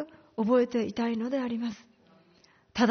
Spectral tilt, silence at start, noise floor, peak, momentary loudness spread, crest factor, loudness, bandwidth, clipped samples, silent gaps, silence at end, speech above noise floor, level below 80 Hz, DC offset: -4.5 dB/octave; 0 s; -62 dBFS; -12 dBFS; 13 LU; 18 dB; -29 LUFS; 6.6 kHz; under 0.1%; none; 0 s; 34 dB; -66 dBFS; under 0.1%